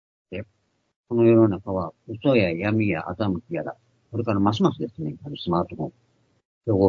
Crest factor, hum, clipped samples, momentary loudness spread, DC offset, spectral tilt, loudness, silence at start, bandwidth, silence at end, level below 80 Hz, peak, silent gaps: 20 dB; none; under 0.1%; 16 LU; under 0.1%; -8.5 dB/octave; -24 LUFS; 0.3 s; 7 kHz; 0 s; -58 dBFS; -4 dBFS; 0.96-1.04 s, 6.45-6.61 s